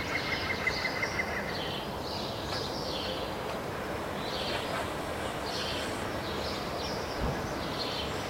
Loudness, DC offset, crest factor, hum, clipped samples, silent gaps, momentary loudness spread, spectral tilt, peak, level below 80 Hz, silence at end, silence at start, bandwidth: -33 LUFS; under 0.1%; 16 dB; none; under 0.1%; none; 5 LU; -4 dB/octave; -18 dBFS; -48 dBFS; 0 s; 0 s; 16 kHz